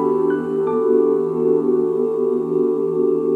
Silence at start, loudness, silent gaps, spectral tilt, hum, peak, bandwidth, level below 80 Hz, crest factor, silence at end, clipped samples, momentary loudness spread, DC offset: 0 s; -18 LUFS; none; -10 dB/octave; none; -6 dBFS; 3.2 kHz; -64 dBFS; 12 dB; 0 s; under 0.1%; 3 LU; under 0.1%